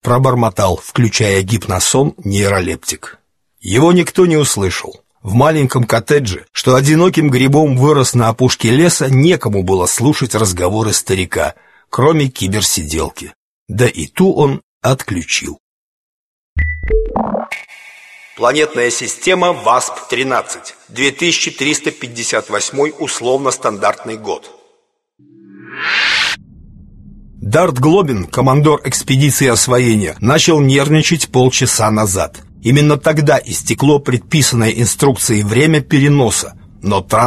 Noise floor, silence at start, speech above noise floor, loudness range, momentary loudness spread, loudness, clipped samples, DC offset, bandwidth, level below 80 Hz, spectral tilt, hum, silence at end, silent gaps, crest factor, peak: -60 dBFS; 0.05 s; 47 dB; 7 LU; 10 LU; -13 LUFS; under 0.1%; under 0.1%; 13 kHz; -34 dBFS; -4.5 dB/octave; none; 0 s; 13.35-13.66 s, 14.63-14.81 s, 15.60-16.56 s; 14 dB; 0 dBFS